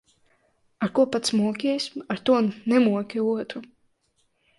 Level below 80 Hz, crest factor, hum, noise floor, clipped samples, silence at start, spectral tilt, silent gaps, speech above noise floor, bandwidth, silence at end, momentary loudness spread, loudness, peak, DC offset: -68 dBFS; 16 dB; none; -70 dBFS; under 0.1%; 0.8 s; -5 dB/octave; none; 46 dB; 11.5 kHz; 0.95 s; 9 LU; -24 LUFS; -8 dBFS; under 0.1%